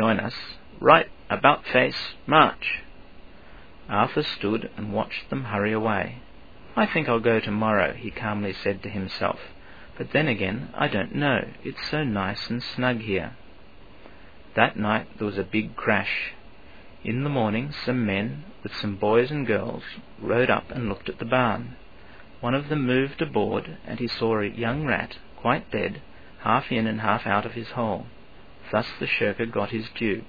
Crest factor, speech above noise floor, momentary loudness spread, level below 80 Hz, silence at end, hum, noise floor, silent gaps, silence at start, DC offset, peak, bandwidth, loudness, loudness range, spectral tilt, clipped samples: 26 dB; 25 dB; 11 LU; -52 dBFS; 0 s; none; -49 dBFS; none; 0 s; 0.5%; 0 dBFS; 5 kHz; -25 LUFS; 4 LU; -7.5 dB/octave; under 0.1%